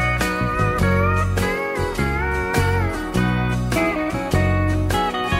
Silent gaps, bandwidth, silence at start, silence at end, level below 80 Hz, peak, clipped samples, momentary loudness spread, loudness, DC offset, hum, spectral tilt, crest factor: none; 16 kHz; 0 s; 0 s; -30 dBFS; -4 dBFS; under 0.1%; 4 LU; -20 LUFS; under 0.1%; none; -6 dB/octave; 14 dB